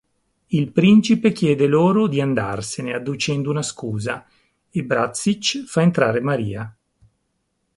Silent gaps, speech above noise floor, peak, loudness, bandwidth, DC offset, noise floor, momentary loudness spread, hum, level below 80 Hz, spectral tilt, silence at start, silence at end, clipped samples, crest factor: none; 53 dB; -2 dBFS; -19 LUFS; 11.5 kHz; under 0.1%; -71 dBFS; 13 LU; none; -54 dBFS; -5.5 dB/octave; 0.5 s; 1.05 s; under 0.1%; 18 dB